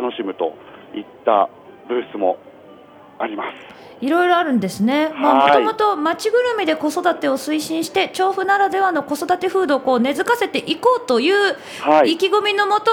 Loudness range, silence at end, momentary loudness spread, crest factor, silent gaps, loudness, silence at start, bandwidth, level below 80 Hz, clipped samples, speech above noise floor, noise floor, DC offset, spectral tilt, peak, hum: 7 LU; 0 s; 11 LU; 18 dB; none; -18 LUFS; 0 s; 19.5 kHz; -64 dBFS; under 0.1%; 25 dB; -43 dBFS; under 0.1%; -4 dB/octave; 0 dBFS; none